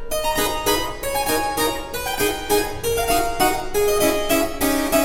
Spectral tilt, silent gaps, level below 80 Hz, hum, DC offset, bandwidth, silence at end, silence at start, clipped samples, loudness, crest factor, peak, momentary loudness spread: -2.5 dB/octave; none; -34 dBFS; none; under 0.1%; 16.5 kHz; 0 s; 0 s; under 0.1%; -20 LUFS; 16 dB; -4 dBFS; 4 LU